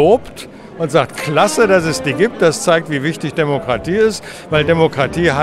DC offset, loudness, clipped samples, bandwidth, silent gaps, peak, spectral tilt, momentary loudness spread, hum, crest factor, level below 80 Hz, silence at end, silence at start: under 0.1%; -15 LUFS; under 0.1%; 14 kHz; none; 0 dBFS; -5 dB/octave; 7 LU; none; 14 dB; -42 dBFS; 0 s; 0 s